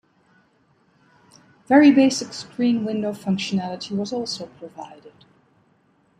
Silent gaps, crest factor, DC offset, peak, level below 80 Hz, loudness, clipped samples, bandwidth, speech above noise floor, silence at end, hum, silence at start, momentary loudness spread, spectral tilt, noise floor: none; 20 dB; under 0.1%; -2 dBFS; -68 dBFS; -20 LUFS; under 0.1%; 10.5 kHz; 41 dB; 1.1 s; none; 1.7 s; 24 LU; -5 dB/octave; -62 dBFS